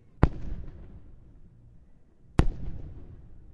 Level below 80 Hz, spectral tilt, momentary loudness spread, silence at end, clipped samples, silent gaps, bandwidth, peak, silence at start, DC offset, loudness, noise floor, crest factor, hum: -36 dBFS; -8.5 dB/octave; 23 LU; 0 s; under 0.1%; none; 11 kHz; 0 dBFS; 0.2 s; under 0.1%; -31 LUFS; -54 dBFS; 30 dB; none